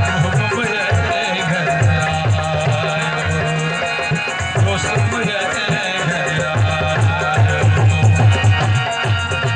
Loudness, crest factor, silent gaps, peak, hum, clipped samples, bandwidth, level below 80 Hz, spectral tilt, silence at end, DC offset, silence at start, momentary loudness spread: -16 LUFS; 12 dB; none; -4 dBFS; none; under 0.1%; 9.6 kHz; -42 dBFS; -5 dB/octave; 0 s; under 0.1%; 0 s; 5 LU